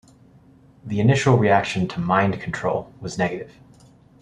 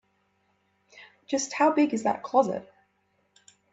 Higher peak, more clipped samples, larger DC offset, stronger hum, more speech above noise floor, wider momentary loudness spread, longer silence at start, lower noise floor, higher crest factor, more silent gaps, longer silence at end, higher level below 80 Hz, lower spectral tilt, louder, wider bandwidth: first, -2 dBFS vs -8 dBFS; neither; neither; neither; second, 31 dB vs 46 dB; first, 16 LU vs 8 LU; about the same, 0.85 s vs 0.95 s; second, -51 dBFS vs -71 dBFS; about the same, 20 dB vs 20 dB; neither; second, 0.75 s vs 1.1 s; first, -54 dBFS vs -76 dBFS; first, -6.5 dB/octave vs -4 dB/octave; first, -21 LUFS vs -26 LUFS; first, 10 kHz vs 8 kHz